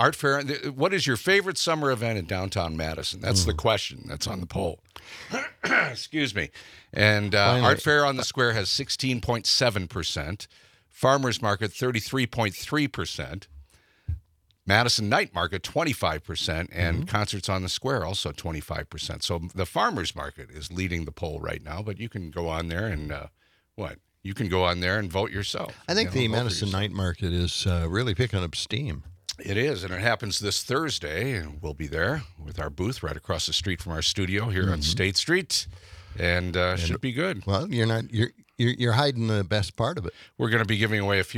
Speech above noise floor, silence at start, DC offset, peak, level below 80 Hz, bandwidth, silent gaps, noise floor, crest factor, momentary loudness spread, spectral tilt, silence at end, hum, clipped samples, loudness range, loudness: 29 dB; 0 s; under 0.1%; -2 dBFS; -48 dBFS; 16 kHz; none; -55 dBFS; 24 dB; 13 LU; -4.5 dB/octave; 0 s; none; under 0.1%; 7 LU; -26 LUFS